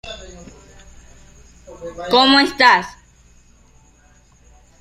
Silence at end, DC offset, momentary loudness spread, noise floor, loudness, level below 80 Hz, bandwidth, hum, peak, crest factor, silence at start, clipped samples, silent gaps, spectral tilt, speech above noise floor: 1.9 s; under 0.1%; 24 LU; -51 dBFS; -13 LUFS; -48 dBFS; 14 kHz; none; 0 dBFS; 20 dB; 0.05 s; under 0.1%; none; -3 dB/octave; 36 dB